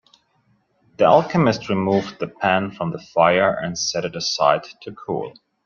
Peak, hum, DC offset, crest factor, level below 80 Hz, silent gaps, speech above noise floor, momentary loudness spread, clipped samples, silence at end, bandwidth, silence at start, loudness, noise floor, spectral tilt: -2 dBFS; none; under 0.1%; 20 dB; -58 dBFS; none; 44 dB; 12 LU; under 0.1%; 0.35 s; 7.2 kHz; 1 s; -20 LUFS; -63 dBFS; -4.5 dB/octave